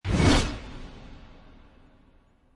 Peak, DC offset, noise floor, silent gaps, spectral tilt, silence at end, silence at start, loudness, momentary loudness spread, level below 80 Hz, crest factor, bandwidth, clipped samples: -8 dBFS; under 0.1%; -59 dBFS; none; -5 dB/octave; 1.4 s; 0.05 s; -23 LUFS; 26 LU; -36 dBFS; 20 dB; 11.5 kHz; under 0.1%